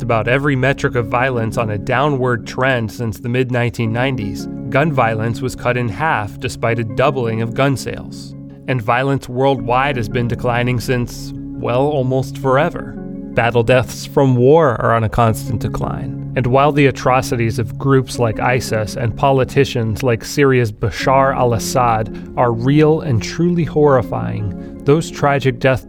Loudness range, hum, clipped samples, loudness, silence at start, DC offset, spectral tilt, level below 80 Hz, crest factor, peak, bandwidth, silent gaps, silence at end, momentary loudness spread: 3 LU; none; under 0.1%; -16 LUFS; 0 s; under 0.1%; -6.5 dB/octave; -36 dBFS; 16 dB; 0 dBFS; 17 kHz; none; 0 s; 9 LU